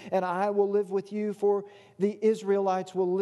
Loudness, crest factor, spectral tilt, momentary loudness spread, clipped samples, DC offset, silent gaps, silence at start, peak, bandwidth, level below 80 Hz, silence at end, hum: -28 LUFS; 14 dB; -7 dB/octave; 5 LU; under 0.1%; under 0.1%; none; 0 s; -14 dBFS; 11.5 kHz; -82 dBFS; 0 s; none